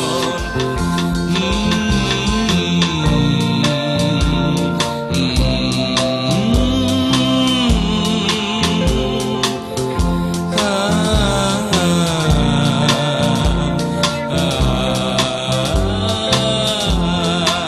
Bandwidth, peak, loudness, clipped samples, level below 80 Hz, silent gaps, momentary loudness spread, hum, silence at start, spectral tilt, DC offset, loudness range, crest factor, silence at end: 13.5 kHz; 0 dBFS; -16 LUFS; under 0.1%; -26 dBFS; none; 4 LU; none; 0 s; -5 dB/octave; under 0.1%; 1 LU; 16 dB; 0 s